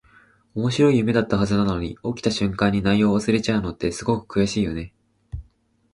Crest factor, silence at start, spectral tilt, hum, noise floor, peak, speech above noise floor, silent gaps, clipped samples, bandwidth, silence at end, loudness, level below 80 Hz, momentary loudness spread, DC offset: 18 dB; 0.55 s; -6 dB/octave; none; -61 dBFS; -4 dBFS; 40 dB; none; under 0.1%; 11 kHz; 0.5 s; -22 LUFS; -42 dBFS; 16 LU; under 0.1%